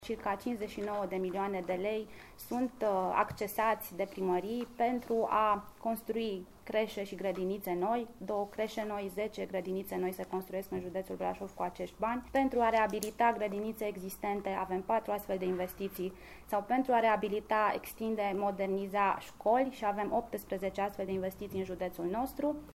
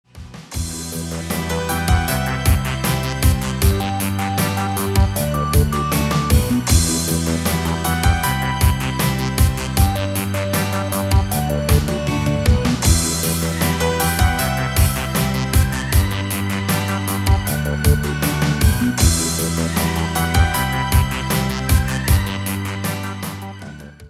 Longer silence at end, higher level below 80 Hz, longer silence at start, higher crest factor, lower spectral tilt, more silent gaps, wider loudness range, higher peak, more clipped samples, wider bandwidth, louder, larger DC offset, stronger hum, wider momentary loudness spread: about the same, 0 s vs 0 s; second, -60 dBFS vs -24 dBFS; second, 0 s vs 0.15 s; about the same, 20 dB vs 16 dB; about the same, -5.5 dB/octave vs -4.5 dB/octave; neither; about the same, 4 LU vs 2 LU; second, -14 dBFS vs -2 dBFS; neither; about the same, 16 kHz vs 16.5 kHz; second, -34 LUFS vs -19 LUFS; neither; neither; about the same, 9 LU vs 7 LU